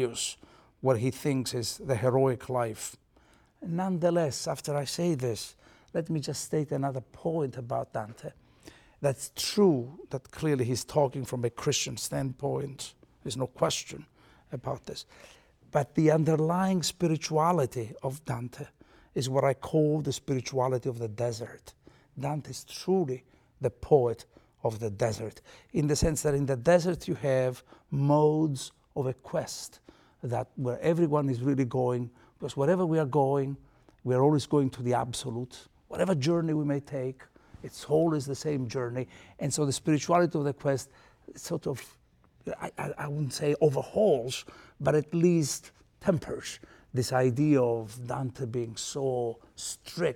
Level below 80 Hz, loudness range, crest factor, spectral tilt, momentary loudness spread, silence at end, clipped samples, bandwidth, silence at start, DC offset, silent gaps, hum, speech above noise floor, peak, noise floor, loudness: -56 dBFS; 5 LU; 20 dB; -5.5 dB/octave; 15 LU; 0 s; under 0.1%; 17.5 kHz; 0 s; under 0.1%; none; none; 33 dB; -8 dBFS; -62 dBFS; -29 LUFS